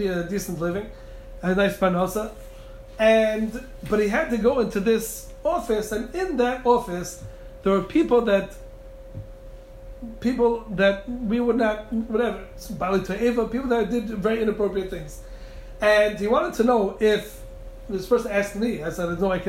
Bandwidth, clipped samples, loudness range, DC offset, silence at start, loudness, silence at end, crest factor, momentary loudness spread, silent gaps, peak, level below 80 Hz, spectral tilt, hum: 16 kHz; under 0.1%; 3 LU; under 0.1%; 0 s; -23 LUFS; 0 s; 18 dB; 20 LU; none; -6 dBFS; -42 dBFS; -5.5 dB/octave; none